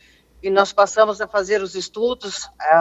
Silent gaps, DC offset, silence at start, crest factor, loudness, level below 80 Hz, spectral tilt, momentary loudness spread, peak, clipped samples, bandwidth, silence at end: none; under 0.1%; 0.45 s; 18 dB; -20 LUFS; -56 dBFS; -3 dB/octave; 11 LU; 0 dBFS; under 0.1%; 8.2 kHz; 0 s